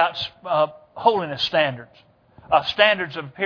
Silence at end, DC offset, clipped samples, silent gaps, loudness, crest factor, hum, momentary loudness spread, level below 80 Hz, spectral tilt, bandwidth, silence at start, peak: 0 s; under 0.1%; under 0.1%; none; -21 LUFS; 22 dB; none; 10 LU; -60 dBFS; -5 dB/octave; 5.4 kHz; 0 s; 0 dBFS